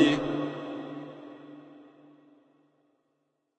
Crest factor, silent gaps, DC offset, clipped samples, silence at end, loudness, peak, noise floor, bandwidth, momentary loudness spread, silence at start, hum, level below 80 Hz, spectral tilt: 24 dB; none; under 0.1%; under 0.1%; 1.7 s; -32 LUFS; -10 dBFS; -77 dBFS; 9 kHz; 24 LU; 0 s; none; -66 dBFS; -5.5 dB/octave